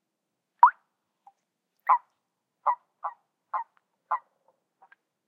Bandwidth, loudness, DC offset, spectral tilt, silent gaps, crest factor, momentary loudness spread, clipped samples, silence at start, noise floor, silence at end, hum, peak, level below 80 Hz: 3.9 kHz; -27 LUFS; under 0.1%; -2 dB/octave; none; 26 dB; 18 LU; under 0.1%; 0.6 s; -83 dBFS; 1.1 s; none; -4 dBFS; under -90 dBFS